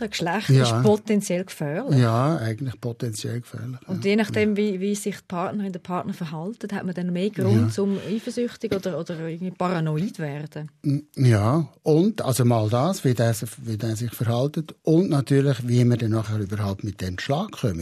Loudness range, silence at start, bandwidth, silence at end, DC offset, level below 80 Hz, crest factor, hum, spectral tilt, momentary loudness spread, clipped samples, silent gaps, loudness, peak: 4 LU; 0 s; 14 kHz; 0 s; under 0.1%; -60 dBFS; 16 dB; none; -6.5 dB/octave; 11 LU; under 0.1%; none; -24 LUFS; -8 dBFS